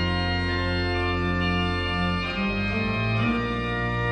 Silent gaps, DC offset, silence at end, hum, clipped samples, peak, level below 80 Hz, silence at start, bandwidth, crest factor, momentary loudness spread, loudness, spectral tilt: none; under 0.1%; 0 s; none; under 0.1%; -12 dBFS; -36 dBFS; 0 s; 9 kHz; 14 dB; 2 LU; -25 LUFS; -7 dB/octave